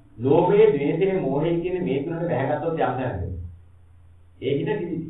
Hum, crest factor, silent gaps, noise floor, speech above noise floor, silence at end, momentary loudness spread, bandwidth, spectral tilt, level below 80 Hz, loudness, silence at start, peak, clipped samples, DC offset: none; 18 dB; none; -51 dBFS; 29 dB; 0 s; 14 LU; 4 kHz; -11 dB/octave; -48 dBFS; -23 LUFS; 0.15 s; -6 dBFS; under 0.1%; 0.2%